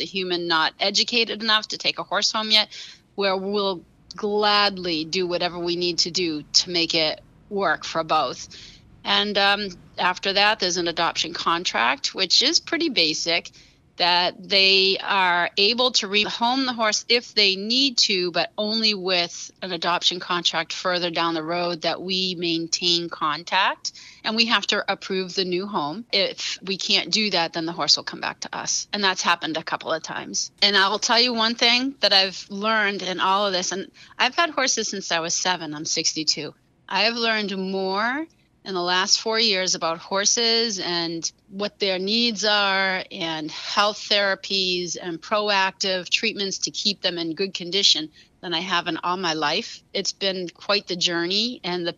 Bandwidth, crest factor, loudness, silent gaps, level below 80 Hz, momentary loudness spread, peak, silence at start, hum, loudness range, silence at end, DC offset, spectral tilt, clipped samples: 12.5 kHz; 22 dB; -21 LUFS; none; -64 dBFS; 10 LU; 0 dBFS; 0 s; none; 4 LU; 0.05 s; under 0.1%; -2 dB/octave; under 0.1%